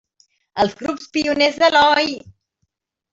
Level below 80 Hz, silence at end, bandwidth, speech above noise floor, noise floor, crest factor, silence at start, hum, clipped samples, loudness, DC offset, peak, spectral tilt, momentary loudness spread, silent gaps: -56 dBFS; 0.8 s; 8 kHz; 56 dB; -73 dBFS; 16 dB; 0.55 s; none; under 0.1%; -17 LUFS; under 0.1%; -2 dBFS; -3.5 dB/octave; 14 LU; none